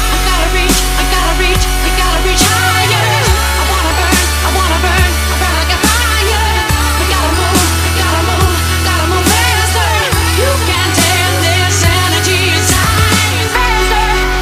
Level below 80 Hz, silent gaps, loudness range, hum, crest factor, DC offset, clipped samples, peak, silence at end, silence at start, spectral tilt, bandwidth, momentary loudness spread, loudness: -16 dBFS; none; 1 LU; none; 10 dB; under 0.1%; under 0.1%; 0 dBFS; 0 s; 0 s; -3 dB/octave; 16 kHz; 2 LU; -11 LUFS